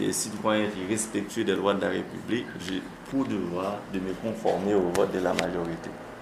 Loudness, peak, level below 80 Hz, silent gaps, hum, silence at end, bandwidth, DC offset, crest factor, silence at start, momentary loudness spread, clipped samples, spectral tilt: -28 LUFS; -6 dBFS; -56 dBFS; none; none; 0 s; 15.5 kHz; under 0.1%; 22 dB; 0 s; 8 LU; under 0.1%; -4.5 dB/octave